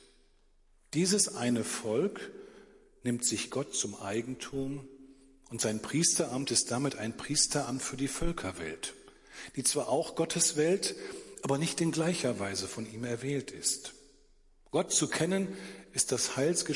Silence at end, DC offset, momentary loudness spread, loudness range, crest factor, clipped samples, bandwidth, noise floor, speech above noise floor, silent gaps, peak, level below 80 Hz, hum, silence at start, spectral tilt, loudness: 0 s; under 0.1%; 12 LU; 4 LU; 20 dB; under 0.1%; 11.5 kHz; -64 dBFS; 32 dB; none; -12 dBFS; -54 dBFS; none; 0.95 s; -3.5 dB/octave; -31 LUFS